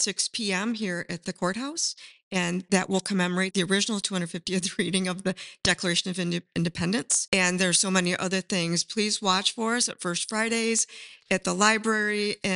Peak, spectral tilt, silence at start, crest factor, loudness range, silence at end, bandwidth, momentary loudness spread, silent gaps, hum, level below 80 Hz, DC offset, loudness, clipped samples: -6 dBFS; -3 dB/octave; 0 s; 22 dB; 3 LU; 0 s; 11.5 kHz; 8 LU; 2.23-2.31 s, 7.28-7.32 s; none; -62 dBFS; under 0.1%; -26 LUFS; under 0.1%